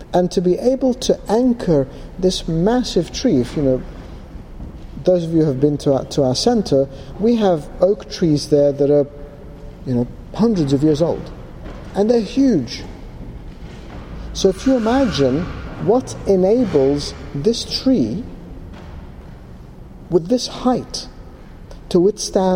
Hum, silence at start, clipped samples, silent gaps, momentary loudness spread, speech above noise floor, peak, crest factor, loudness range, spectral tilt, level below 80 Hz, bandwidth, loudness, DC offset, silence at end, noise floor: none; 0 s; under 0.1%; none; 20 LU; 20 dB; -2 dBFS; 16 dB; 5 LU; -6 dB/octave; -36 dBFS; 16 kHz; -18 LUFS; under 0.1%; 0 s; -37 dBFS